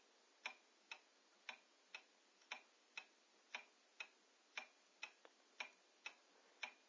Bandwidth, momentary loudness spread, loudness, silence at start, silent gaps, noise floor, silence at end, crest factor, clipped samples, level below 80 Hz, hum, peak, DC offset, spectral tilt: 8 kHz; 10 LU; -57 LUFS; 0 s; none; -74 dBFS; 0 s; 26 dB; under 0.1%; under -90 dBFS; none; -34 dBFS; under 0.1%; 2 dB/octave